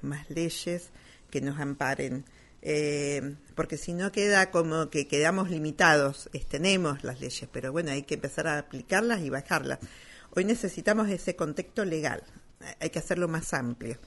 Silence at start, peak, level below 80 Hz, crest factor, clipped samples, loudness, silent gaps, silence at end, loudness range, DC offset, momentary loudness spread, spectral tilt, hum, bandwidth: 0 s; -6 dBFS; -52 dBFS; 24 dB; under 0.1%; -29 LUFS; none; 0 s; 6 LU; under 0.1%; 13 LU; -4.5 dB/octave; none; 11.5 kHz